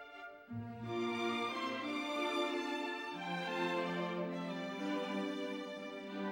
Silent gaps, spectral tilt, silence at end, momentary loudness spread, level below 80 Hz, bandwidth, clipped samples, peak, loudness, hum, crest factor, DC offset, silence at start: none; -5 dB/octave; 0 s; 8 LU; -80 dBFS; 16 kHz; under 0.1%; -24 dBFS; -39 LUFS; none; 16 dB; under 0.1%; 0 s